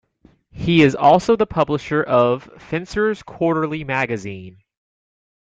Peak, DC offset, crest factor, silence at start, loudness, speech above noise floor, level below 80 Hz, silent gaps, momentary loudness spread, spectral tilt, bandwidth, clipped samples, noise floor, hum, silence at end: -2 dBFS; under 0.1%; 18 dB; 0.55 s; -18 LUFS; 37 dB; -48 dBFS; none; 13 LU; -6.5 dB/octave; 9 kHz; under 0.1%; -55 dBFS; none; 0.95 s